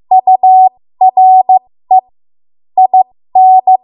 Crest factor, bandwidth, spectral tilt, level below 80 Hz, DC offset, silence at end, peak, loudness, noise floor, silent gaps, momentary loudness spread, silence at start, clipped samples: 8 dB; 1 kHz; -9.5 dB/octave; -68 dBFS; under 0.1%; 0.1 s; 0 dBFS; -8 LUFS; under -90 dBFS; none; 6 LU; 0.1 s; under 0.1%